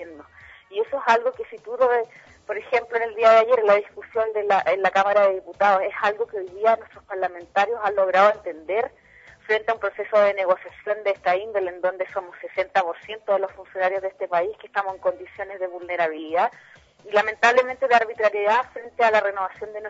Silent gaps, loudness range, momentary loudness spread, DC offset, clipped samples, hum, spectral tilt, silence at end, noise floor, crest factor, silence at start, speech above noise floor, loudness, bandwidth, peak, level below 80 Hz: none; 6 LU; 13 LU; under 0.1%; under 0.1%; none; -3.5 dB/octave; 0 s; -48 dBFS; 18 dB; 0 s; 26 dB; -22 LUFS; 7.8 kHz; -4 dBFS; -64 dBFS